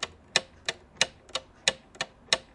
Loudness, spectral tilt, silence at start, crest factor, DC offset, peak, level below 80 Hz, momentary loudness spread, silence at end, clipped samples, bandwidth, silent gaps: -30 LUFS; 0 dB/octave; 0 s; 30 dB; under 0.1%; -4 dBFS; -62 dBFS; 9 LU; 0.15 s; under 0.1%; 11.5 kHz; none